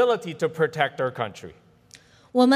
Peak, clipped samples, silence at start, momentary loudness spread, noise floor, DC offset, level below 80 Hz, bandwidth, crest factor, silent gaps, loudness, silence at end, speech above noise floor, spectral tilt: -6 dBFS; under 0.1%; 0 s; 14 LU; -53 dBFS; under 0.1%; -68 dBFS; 13 kHz; 18 dB; none; -25 LUFS; 0 s; 27 dB; -5.5 dB/octave